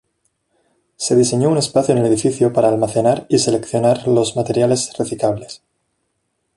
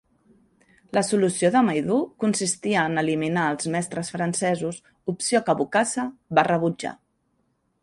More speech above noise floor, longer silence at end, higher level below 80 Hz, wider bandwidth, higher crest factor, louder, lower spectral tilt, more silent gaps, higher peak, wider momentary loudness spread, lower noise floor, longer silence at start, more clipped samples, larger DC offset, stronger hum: first, 55 dB vs 47 dB; about the same, 1 s vs 0.9 s; first, -54 dBFS vs -64 dBFS; about the same, 11.5 kHz vs 11.5 kHz; about the same, 16 dB vs 20 dB; first, -16 LUFS vs -23 LUFS; about the same, -5.5 dB/octave vs -4.5 dB/octave; neither; about the same, -2 dBFS vs -4 dBFS; second, 6 LU vs 9 LU; about the same, -70 dBFS vs -70 dBFS; about the same, 1 s vs 0.95 s; neither; neither; neither